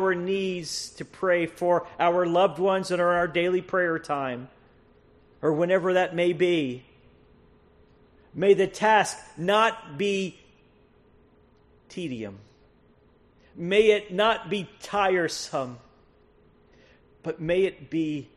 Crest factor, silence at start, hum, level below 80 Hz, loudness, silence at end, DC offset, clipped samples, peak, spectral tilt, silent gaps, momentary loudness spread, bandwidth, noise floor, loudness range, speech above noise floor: 20 dB; 0 s; none; -60 dBFS; -25 LUFS; 0.15 s; under 0.1%; under 0.1%; -6 dBFS; -5 dB/octave; none; 14 LU; 12.5 kHz; -59 dBFS; 6 LU; 35 dB